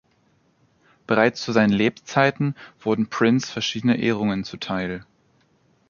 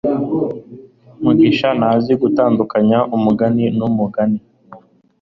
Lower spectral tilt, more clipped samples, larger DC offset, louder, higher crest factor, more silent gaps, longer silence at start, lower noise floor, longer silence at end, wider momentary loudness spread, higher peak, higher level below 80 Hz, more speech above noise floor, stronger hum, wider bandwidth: second, -5.5 dB/octave vs -9 dB/octave; neither; neither; second, -22 LUFS vs -15 LUFS; first, 22 dB vs 14 dB; neither; first, 1.1 s vs 0.05 s; first, -63 dBFS vs -43 dBFS; first, 0.9 s vs 0.45 s; about the same, 9 LU vs 8 LU; about the same, -2 dBFS vs -2 dBFS; second, -58 dBFS vs -52 dBFS; first, 41 dB vs 28 dB; neither; first, 7.2 kHz vs 6 kHz